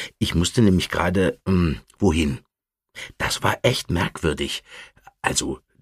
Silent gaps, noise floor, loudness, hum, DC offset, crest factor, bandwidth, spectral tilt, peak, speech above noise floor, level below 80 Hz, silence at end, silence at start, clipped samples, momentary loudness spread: none; -58 dBFS; -22 LUFS; none; under 0.1%; 20 dB; 15.5 kHz; -5 dB/octave; -2 dBFS; 36 dB; -38 dBFS; 0.25 s; 0 s; under 0.1%; 13 LU